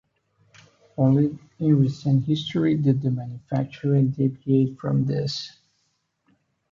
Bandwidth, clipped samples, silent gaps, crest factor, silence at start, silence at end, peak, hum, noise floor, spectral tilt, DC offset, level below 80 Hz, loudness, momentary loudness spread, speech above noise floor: 7.4 kHz; under 0.1%; none; 16 dB; 1 s; 1.25 s; -8 dBFS; none; -72 dBFS; -8.5 dB/octave; under 0.1%; -62 dBFS; -23 LUFS; 9 LU; 50 dB